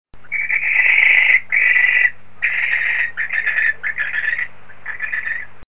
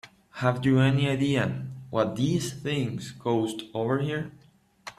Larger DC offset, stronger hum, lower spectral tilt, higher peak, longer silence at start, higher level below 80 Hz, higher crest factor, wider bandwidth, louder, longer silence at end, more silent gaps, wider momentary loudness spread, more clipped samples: first, 3% vs under 0.1%; neither; second, -3 dB/octave vs -6.5 dB/octave; first, 0 dBFS vs -8 dBFS; about the same, 0.05 s vs 0.05 s; about the same, -56 dBFS vs -60 dBFS; about the same, 18 dB vs 18 dB; second, 4 kHz vs 13 kHz; first, -15 LUFS vs -27 LUFS; about the same, 0.1 s vs 0.1 s; neither; first, 14 LU vs 11 LU; neither